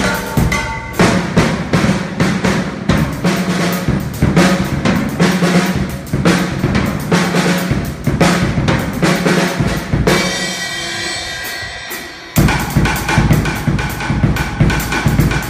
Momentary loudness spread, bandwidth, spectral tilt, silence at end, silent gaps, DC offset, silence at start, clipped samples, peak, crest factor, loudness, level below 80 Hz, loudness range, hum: 6 LU; 15.5 kHz; -5.5 dB/octave; 0 s; none; under 0.1%; 0 s; under 0.1%; 0 dBFS; 14 dB; -15 LUFS; -26 dBFS; 2 LU; none